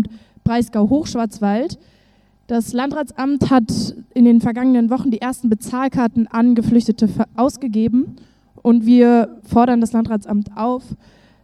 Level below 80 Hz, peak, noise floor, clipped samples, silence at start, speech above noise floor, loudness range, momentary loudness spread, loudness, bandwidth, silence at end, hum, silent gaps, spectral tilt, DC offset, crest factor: -46 dBFS; 0 dBFS; -55 dBFS; under 0.1%; 0 s; 39 dB; 4 LU; 10 LU; -17 LUFS; 12.5 kHz; 0.5 s; none; none; -7 dB/octave; under 0.1%; 16 dB